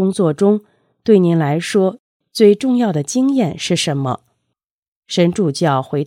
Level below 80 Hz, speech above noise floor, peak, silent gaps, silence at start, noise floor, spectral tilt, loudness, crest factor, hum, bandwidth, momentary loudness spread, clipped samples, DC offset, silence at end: -60 dBFS; 61 dB; 0 dBFS; 1.99-2.20 s, 4.71-4.82 s, 4.88-5.02 s; 0 s; -76 dBFS; -6 dB/octave; -16 LUFS; 16 dB; none; 14.5 kHz; 9 LU; under 0.1%; under 0.1%; 0 s